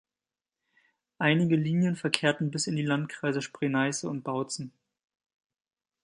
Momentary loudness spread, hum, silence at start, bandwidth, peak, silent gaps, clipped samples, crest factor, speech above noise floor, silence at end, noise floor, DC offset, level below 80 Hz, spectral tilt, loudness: 8 LU; none; 1.2 s; 11.5 kHz; -4 dBFS; none; under 0.1%; 26 dB; over 62 dB; 1.35 s; under -90 dBFS; under 0.1%; -74 dBFS; -5 dB/octave; -28 LUFS